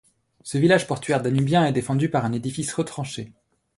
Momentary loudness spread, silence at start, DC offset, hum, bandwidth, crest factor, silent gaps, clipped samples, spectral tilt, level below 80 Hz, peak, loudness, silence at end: 13 LU; 0.45 s; under 0.1%; none; 11.5 kHz; 18 dB; none; under 0.1%; -6 dB/octave; -58 dBFS; -4 dBFS; -23 LUFS; 0.5 s